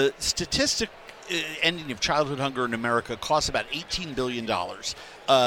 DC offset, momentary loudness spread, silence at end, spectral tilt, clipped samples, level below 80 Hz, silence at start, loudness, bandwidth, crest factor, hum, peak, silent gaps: under 0.1%; 8 LU; 0 s; -3 dB/octave; under 0.1%; -48 dBFS; 0 s; -26 LUFS; 17 kHz; 22 dB; none; -6 dBFS; none